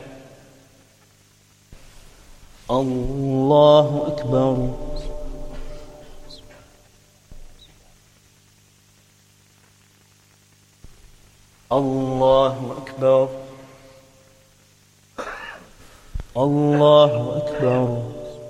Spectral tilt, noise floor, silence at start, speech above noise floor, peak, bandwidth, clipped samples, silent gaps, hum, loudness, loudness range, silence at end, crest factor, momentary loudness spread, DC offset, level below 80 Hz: -7.5 dB/octave; -55 dBFS; 0 s; 38 dB; -2 dBFS; 12 kHz; under 0.1%; none; 50 Hz at -55 dBFS; -19 LUFS; 12 LU; 0 s; 22 dB; 27 LU; under 0.1%; -40 dBFS